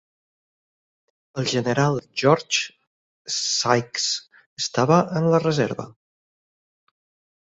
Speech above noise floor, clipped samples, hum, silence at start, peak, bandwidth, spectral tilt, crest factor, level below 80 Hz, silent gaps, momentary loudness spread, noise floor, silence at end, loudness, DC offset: over 69 dB; under 0.1%; none; 1.35 s; -2 dBFS; 8.2 kHz; -4 dB/octave; 22 dB; -62 dBFS; 2.87-3.25 s, 4.46-4.56 s; 12 LU; under -90 dBFS; 1.55 s; -22 LUFS; under 0.1%